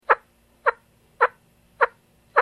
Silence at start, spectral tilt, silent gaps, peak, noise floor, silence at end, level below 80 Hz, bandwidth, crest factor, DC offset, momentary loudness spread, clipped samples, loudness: 0.1 s; -3.5 dB/octave; none; 0 dBFS; -57 dBFS; 0 s; -66 dBFS; 13 kHz; 24 dB; under 0.1%; 3 LU; under 0.1%; -24 LUFS